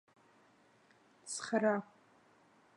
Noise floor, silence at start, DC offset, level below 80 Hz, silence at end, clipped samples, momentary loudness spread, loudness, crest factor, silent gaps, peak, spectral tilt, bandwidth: -68 dBFS; 1.25 s; under 0.1%; under -90 dBFS; 0.9 s; under 0.1%; 23 LU; -36 LUFS; 22 dB; none; -20 dBFS; -4 dB/octave; 11 kHz